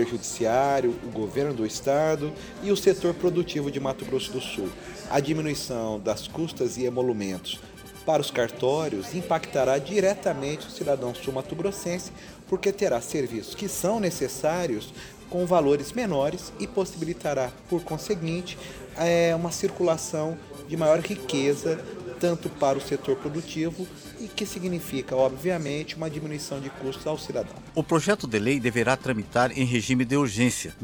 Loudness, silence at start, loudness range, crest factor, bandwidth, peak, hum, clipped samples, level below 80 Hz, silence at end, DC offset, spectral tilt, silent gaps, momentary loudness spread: -27 LUFS; 0 s; 4 LU; 20 dB; over 20 kHz; -8 dBFS; none; under 0.1%; -54 dBFS; 0 s; under 0.1%; -5 dB/octave; none; 10 LU